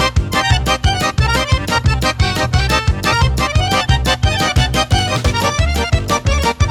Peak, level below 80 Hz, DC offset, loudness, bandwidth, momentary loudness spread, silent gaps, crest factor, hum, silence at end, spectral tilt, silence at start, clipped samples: 0 dBFS; -20 dBFS; under 0.1%; -15 LUFS; 18.5 kHz; 2 LU; none; 14 dB; none; 0 s; -4.5 dB/octave; 0 s; under 0.1%